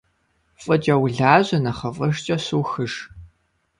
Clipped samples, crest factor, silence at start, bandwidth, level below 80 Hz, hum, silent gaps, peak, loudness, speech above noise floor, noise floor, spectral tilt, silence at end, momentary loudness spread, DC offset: under 0.1%; 22 dB; 0.6 s; 11 kHz; -52 dBFS; none; none; 0 dBFS; -20 LUFS; 46 dB; -66 dBFS; -6 dB/octave; 0.55 s; 14 LU; under 0.1%